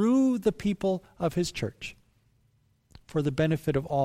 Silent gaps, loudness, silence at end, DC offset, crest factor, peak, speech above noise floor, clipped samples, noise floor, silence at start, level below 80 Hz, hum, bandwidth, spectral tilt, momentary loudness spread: none; -28 LUFS; 0 s; under 0.1%; 14 dB; -14 dBFS; 39 dB; under 0.1%; -67 dBFS; 0 s; -54 dBFS; none; 15.5 kHz; -6.5 dB/octave; 11 LU